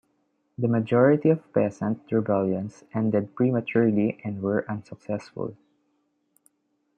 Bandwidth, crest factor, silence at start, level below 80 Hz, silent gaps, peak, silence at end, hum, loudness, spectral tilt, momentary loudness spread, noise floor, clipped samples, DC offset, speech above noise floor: 8.2 kHz; 18 dB; 0.6 s; -70 dBFS; none; -8 dBFS; 1.45 s; none; -25 LUFS; -9.5 dB/octave; 15 LU; -73 dBFS; under 0.1%; under 0.1%; 49 dB